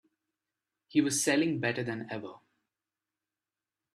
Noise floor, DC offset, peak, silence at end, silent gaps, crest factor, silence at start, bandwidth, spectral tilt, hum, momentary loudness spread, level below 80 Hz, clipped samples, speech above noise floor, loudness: under -90 dBFS; under 0.1%; -14 dBFS; 1.6 s; none; 20 dB; 0.95 s; 14 kHz; -4 dB/octave; none; 14 LU; -76 dBFS; under 0.1%; over 60 dB; -30 LUFS